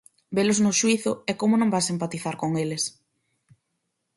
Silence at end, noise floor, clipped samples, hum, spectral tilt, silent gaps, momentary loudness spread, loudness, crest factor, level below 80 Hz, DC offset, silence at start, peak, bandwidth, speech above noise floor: 1.25 s; -78 dBFS; under 0.1%; none; -4 dB/octave; none; 9 LU; -24 LUFS; 16 dB; -66 dBFS; under 0.1%; 0.3 s; -10 dBFS; 11.5 kHz; 54 dB